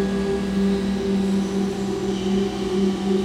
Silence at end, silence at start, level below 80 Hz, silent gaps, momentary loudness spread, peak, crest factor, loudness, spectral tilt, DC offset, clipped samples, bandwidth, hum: 0 s; 0 s; -42 dBFS; none; 3 LU; -10 dBFS; 12 dB; -23 LUFS; -6.5 dB/octave; under 0.1%; under 0.1%; 11.5 kHz; none